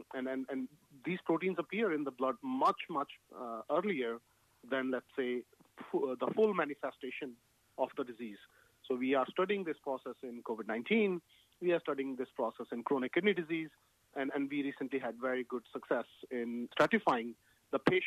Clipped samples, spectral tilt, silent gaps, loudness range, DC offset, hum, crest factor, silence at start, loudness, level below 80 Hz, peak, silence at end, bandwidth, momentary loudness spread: under 0.1%; -6.5 dB/octave; none; 3 LU; under 0.1%; none; 24 dB; 0 s; -36 LUFS; -78 dBFS; -12 dBFS; 0 s; 14 kHz; 13 LU